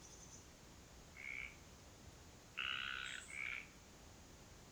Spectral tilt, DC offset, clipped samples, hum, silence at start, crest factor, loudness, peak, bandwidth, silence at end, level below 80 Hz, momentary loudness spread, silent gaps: -1.5 dB/octave; under 0.1%; under 0.1%; none; 0 s; 22 dB; -47 LUFS; -28 dBFS; over 20 kHz; 0 s; -68 dBFS; 17 LU; none